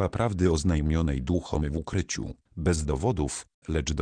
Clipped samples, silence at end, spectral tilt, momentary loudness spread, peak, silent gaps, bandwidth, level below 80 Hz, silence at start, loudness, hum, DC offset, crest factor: under 0.1%; 0 s; -6 dB/octave; 8 LU; -10 dBFS; 3.54-3.62 s; 10 kHz; -36 dBFS; 0 s; -28 LUFS; none; under 0.1%; 16 dB